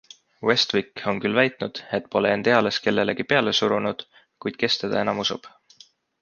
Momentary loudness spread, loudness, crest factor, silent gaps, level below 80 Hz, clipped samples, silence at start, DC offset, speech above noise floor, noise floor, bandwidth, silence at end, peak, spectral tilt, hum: 10 LU; -23 LUFS; 22 dB; none; -62 dBFS; under 0.1%; 0.4 s; under 0.1%; 31 dB; -54 dBFS; 7.2 kHz; 0.75 s; -2 dBFS; -4.5 dB/octave; none